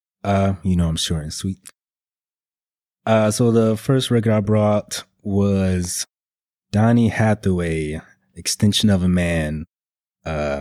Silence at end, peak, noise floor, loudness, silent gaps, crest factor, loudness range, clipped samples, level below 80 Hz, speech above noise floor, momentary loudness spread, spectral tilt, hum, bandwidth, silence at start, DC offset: 0 s; -4 dBFS; under -90 dBFS; -20 LUFS; none; 16 dB; 3 LU; under 0.1%; -40 dBFS; over 72 dB; 12 LU; -5.5 dB/octave; none; 15.5 kHz; 0.25 s; under 0.1%